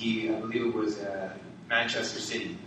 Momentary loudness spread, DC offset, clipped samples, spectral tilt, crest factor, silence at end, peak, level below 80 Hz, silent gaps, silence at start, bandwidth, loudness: 10 LU; under 0.1%; under 0.1%; -3.5 dB/octave; 18 dB; 0 s; -12 dBFS; -68 dBFS; none; 0 s; 10 kHz; -30 LUFS